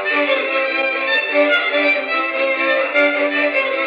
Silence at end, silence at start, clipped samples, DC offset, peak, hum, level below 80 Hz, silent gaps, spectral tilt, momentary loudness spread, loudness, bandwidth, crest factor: 0 s; 0 s; under 0.1%; under 0.1%; -2 dBFS; none; -70 dBFS; none; -3 dB/octave; 3 LU; -16 LUFS; 5.6 kHz; 14 dB